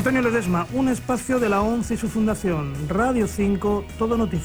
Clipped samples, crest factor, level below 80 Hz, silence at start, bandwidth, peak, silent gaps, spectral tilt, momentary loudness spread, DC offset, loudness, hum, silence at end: under 0.1%; 12 dB; -38 dBFS; 0 s; over 20 kHz; -8 dBFS; none; -6.5 dB/octave; 4 LU; under 0.1%; -23 LUFS; none; 0 s